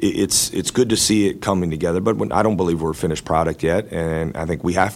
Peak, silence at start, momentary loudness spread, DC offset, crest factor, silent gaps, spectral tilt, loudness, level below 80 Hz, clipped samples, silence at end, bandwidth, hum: -2 dBFS; 0 s; 7 LU; under 0.1%; 18 dB; none; -4.5 dB/octave; -19 LUFS; -40 dBFS; under 0.1%; 0 s; 16.5 kHz; none